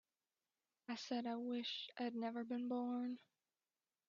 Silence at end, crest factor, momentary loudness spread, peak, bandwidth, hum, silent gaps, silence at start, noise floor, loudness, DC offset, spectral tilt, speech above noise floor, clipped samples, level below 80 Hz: 0.9 s; 16 dB; 8 LU; -32 dBFS; 7.2 kHz; none; none; 0.9 s; under -90 dBFS; -45 LUFS; under 0.1%; -2.5 dB/octave; over 46 dB; under 0.1%; under -90 dBFS